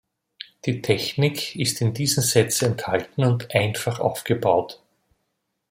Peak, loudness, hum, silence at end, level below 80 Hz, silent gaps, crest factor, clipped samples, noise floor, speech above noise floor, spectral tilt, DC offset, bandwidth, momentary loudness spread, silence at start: -4 dBFS; -22 LUFS; none; 0.95 s; -60 dBFS; none; 20 dB; under 0.1%; -76 dBFS; 54 dB; -4.5 dB/octave; under 0.1%; 16.5 kHz; 9 LU; 0.65 s